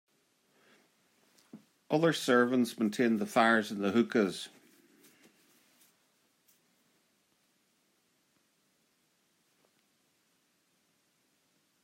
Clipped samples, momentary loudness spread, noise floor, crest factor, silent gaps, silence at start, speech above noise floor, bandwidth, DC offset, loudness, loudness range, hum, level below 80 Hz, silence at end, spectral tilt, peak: under 0.1%; 8 LU; -74 dBFS; 22 dB; none; 1.55 s; 46 dB; 16 kHz; under 0.1%; -29 LUFS; 8 LU; none; -86 dBFS; 7.35 s; -5 dB/octave; -14 dBFS